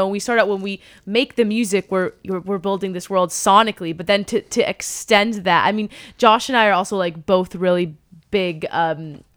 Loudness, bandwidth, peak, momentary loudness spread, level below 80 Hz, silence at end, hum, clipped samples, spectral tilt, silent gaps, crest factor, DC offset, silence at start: -19 LUFS; over 20 kHz; 0 dBFS; 10 LU; -56 dBFS; 0.2 s; none; under 0.1%; -4 dB/octave; none; 20 dB; under 0.1%; 0 s